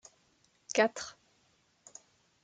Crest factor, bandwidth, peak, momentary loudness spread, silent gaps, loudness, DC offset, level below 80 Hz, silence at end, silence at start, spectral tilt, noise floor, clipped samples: 26 dB; 9.4 kHz; -12 dBFS; 24 LU; none; -32 LUFS; under 0.1%; -80 dBFS; 1.3 s; 0.7 s; -2.5 dB/octave; -71 dBFS; under 0.1%